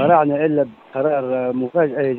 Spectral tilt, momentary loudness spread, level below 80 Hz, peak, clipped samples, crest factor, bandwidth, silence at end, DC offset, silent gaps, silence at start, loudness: -10.5 dB/octave; 7 LU; -62 dBFS; -2 dBFS; under 0.1%; 16 dB; 4.3 kHz; 0 s; under 0.1%; none; 0 s; -19 LUFS